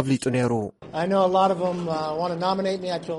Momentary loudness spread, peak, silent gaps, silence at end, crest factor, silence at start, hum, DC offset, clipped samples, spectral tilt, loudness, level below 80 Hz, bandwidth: 8 LU; -8 dBFS; none; 0 s; 16 dB; 0 s; none; under 0.1%; under 0.1%; -6 dB/octave; -24 LUFS; -60 dBFS; 11.5 kHz